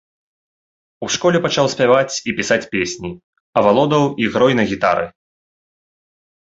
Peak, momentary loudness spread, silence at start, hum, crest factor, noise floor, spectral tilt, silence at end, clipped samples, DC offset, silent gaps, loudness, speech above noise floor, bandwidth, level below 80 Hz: 0 dBFS; 9 LU; 1 s; none; 18 dB; under -90 dBFS; -4.5 dB/octave; 1.4 s; under 0.1%; under 0.1%; 3.24-3.33 s, 3.40-3.53 s; -16 LUFS; over 74 dB; 8 kHz; -52 dBFS